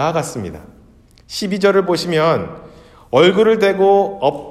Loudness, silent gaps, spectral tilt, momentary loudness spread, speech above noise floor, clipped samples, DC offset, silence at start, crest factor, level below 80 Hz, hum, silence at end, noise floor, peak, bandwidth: -15 LUFS; none; -5.5 dB/octave; 15 LU; 32 dB; under 0.1%; under 0.1%; 0 s; 16 dB; -50 dBFS; none; 0 s; -47 dBFS; 0 dBFS; 14 kHz